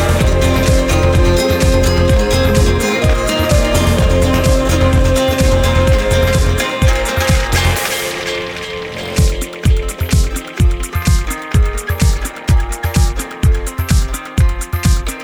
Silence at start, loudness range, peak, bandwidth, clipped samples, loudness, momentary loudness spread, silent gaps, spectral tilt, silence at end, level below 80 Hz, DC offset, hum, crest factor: 0 s; 4 LU; 0 dBFS; over 20 kHz; under 0.1%; -14 LUFS; 5 LU; none; -5 dB/octave; 0 s; -16 dBFS; under 0.1%; none; 12 dB